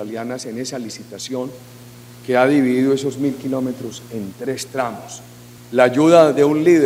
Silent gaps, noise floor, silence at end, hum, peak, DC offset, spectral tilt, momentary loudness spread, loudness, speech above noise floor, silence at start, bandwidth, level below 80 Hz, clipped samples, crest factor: none; -40 dBFS; 0 s; 60 Hz at -40 dBFS; 0 dBFS; under 0.1%; -5.5 dB/octave; 19 LU; -18 LUFS; 22 dB; 0 s; 16 kHz; -60 dBFS; under 0.1%; 18 dB